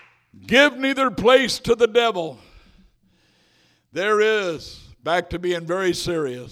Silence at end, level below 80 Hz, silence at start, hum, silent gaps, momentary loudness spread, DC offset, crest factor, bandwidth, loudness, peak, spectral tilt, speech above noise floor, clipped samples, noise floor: 0 s; -50 dBFS; 0.45 s; none; none; 15 LU; under 0.1%; 22 dB; 16 kHz; -20 LUFS; 0 dBFS; -4 dB/octave; 41 dB; under 0.1%; -61 dBFS